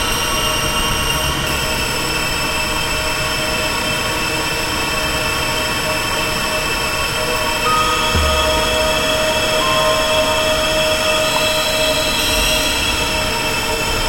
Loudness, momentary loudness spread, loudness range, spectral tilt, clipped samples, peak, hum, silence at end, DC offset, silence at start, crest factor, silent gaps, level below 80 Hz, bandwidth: -16 LUFS; 3 LU; 3 LU; -2.5 dB/octave; under 0.1%; -2 dBFS; none; 0 s; under 0.1%; 0 s; 14 dB; none; -28 dBFS; 16 kHz